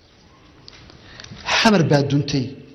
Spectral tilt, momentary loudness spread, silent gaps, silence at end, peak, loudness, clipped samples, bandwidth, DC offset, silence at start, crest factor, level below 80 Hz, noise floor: -5 dB/octave; 21 LU; none; 0.2 s; -4 dBFS; -18 LUFS; under 0.1%; 12.5 kHz; under 0.1%; 1.1 s; 16 dB; -50 dBFS; -50 dBFS